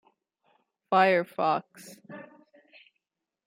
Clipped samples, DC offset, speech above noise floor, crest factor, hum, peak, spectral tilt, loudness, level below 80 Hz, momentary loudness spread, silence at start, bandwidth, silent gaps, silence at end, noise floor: under 0.1%; under 0.1%; 57 dB; 22 dB; none; -8 dBFS; -5.5 dB/octave; -25 LUFS; -82 dBFS; 25 LU; 0.9 s; 16 kHz; none; 1.25 s; -83 dBFS